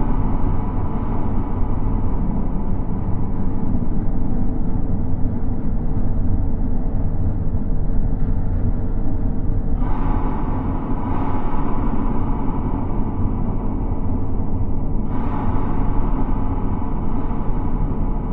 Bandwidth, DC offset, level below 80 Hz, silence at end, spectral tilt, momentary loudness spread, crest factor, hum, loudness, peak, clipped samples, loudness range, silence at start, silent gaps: 2.6 kHz; under 0.1%; -20 dBFS; 0 s; -12.5 dB/octave; 2 LU; 12 dB; none; -24 LUFS; -4 dBFS; under 0.1%; 0 LU; 0 s; none